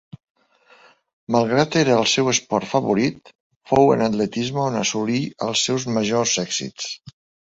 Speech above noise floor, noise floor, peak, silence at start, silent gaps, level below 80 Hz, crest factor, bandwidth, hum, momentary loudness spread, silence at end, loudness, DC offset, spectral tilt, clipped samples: 34 dB; -54 dBFS; -2 dBFS; 1.3 s; 3.35-3.50 s, 3.56-3.60 s; -56 dBFS; 20 dB; 8.2 kHz; none; 8 LU; 0.45 s; -20 LUFS; under 0.1%; -4 dB/octave; under 0.1%